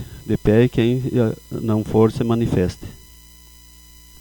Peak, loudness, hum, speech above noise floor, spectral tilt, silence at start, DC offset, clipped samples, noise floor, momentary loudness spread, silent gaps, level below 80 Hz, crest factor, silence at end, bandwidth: -2 dBFS; -19 LUFS; 60 Hz at -40 dBFS; 27 dB; -8 dB/octave; 0 s; under 0.1%; under 0.1%; -45 dBFS; 10 LU; none; -40 dBFS; 18 dB; 1.25 s; over 20 kHz